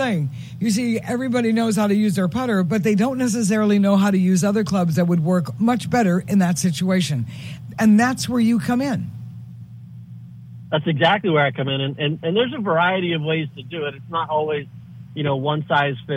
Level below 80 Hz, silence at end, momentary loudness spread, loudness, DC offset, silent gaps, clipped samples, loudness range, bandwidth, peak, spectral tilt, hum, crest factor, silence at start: -56 dBFS; 0 s; 17 LU; -20 LUFS; under 0.1%; none; under 0.1%; 4 LU; 16 kHz; -4 dBFS; -6 dB/octave; none; 16 dB; 0 s